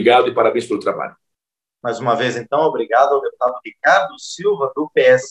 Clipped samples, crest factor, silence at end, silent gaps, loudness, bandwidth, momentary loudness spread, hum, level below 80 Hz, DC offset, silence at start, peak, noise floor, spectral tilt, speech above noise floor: under 0.1%; 16 dB; 0 s; none; -17 LUFS; 10.5 kHz; 11 LU; none; -70 dBFS; under 0.1%; 0 s; -2 dBFS; -84 dBFS; -4.5 dB/octave; 68 dB